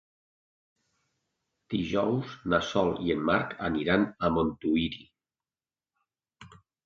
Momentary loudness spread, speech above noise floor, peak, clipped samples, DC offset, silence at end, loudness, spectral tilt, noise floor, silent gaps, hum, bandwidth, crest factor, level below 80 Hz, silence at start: 7 LU; over 62 dB; -10 dBFS; under 0.1%; under 0.1%; 0.3 s; -28 LUFS; -6.5 dB/octave; under -90 dBFS; none; none; 7.4 kHz; 22 dB; -54 dBFS; 1.7 s